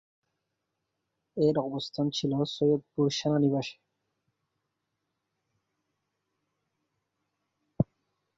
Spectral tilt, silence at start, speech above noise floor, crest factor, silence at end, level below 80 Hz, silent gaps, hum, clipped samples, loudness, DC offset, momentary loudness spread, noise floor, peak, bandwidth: -6.5 dB/octave; 1.35 s; 55 dB; 22 dB; 0.55 s; -64 dBFS; none; none; under 0.1%; -29 LUFS; under 0.1%; 7 LU; -83 dBFS; -10 dBFS; 7.8 kHz